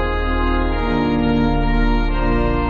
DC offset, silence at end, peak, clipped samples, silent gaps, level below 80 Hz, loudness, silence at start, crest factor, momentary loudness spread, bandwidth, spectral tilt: under 0.1%; 0 s; -6 dBFS; under 0.1%; none; -20 dBFS; -19 LUFS; 0 s; 12 dB; 3 LU; 4.9 kHz; -5.5 dB/octave